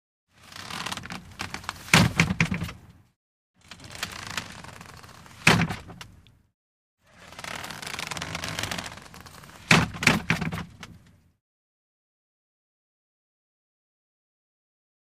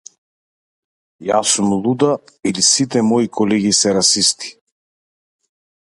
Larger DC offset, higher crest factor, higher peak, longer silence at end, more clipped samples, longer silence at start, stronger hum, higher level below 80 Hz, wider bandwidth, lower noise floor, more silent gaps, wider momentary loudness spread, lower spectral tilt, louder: neither; first, 28 dB vs 18 dB; about the same, -2 dBFS vs 0 dBFS; first, 4.2 s vs 1.45 s; neither; second, 0.45 s vs 1.2 s; neither; first, -50 dBFS vs -58 dBFS; first, 15.5 kHz vs 11.5 kHz; second, -54 dBFS vs under -90 dBFS; first, 3.16-3.54 s, 6.54-6.98 s vs none; first, 25 LU vs 10 LU; about the same, -4 dB/octave vs -3 dB/octave; second, -26 LUFS vs -15 LUFS